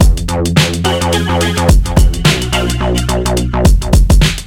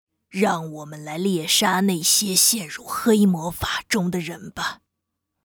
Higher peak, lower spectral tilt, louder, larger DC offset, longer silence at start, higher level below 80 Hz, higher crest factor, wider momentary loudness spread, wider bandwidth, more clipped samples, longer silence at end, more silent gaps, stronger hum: first, 0 dBFS vs -4 dBFS; first, -5 dB/octave vs -3 dB/octave; first, -12 LUFS vs -20 LUFS; first, 1% vs under 0.1%; second, 0 s vs 0.35 s; first, -14 dBFS vs -52 dBFS; second, 10 dB vs 20 dB; second, 4 LU vs 14 LU; second, 17 kHz vs over 20 kHz; first, 0.2% vs under 0.1%; second, 0 s vs 0.7 s; neither; neither